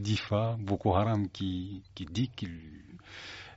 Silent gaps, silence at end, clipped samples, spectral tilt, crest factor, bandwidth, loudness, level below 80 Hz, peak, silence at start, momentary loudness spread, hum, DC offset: none; 0 s; under 0.1%; -6 dB/octave; 20 dB; 8 kHz; -32 LUFS; -56 dBFS; -12 dBFS; 0 s; 19 LU; none; under 0.1%